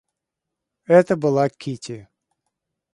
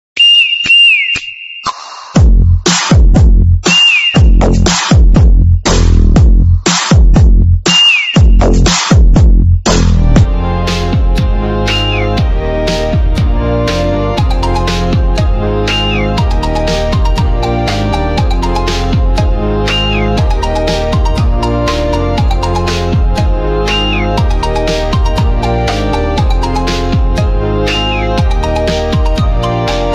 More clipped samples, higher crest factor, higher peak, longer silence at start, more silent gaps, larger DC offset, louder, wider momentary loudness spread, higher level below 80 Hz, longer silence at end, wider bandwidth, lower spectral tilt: neither; first, 20 dB vs 8 dB; about the same, -2 dBFS vs 0 dBFS; first, 0.9 s vs 0.15 s; neither; neither; second, -18 LUFS vs -10 LUFS; first, 19 LU vs 8 LU; second, -64 dBFS vs -12 dBFS; first, 0.95 s vs 0 s; first, 11 kHz vs 9 kHz; first, -7 dB/octave vs -4.5 dB/octave